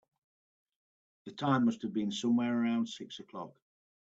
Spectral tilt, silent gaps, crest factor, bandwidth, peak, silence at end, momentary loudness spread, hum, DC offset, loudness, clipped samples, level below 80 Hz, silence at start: -6 dB/octave; none; 20 dB; 8 kHz; -16 dBFS; 0.65 s; 18 LU; none; under 0.1%; -32 LUFS; under 0.1%; -78 dBFS; 1.25 s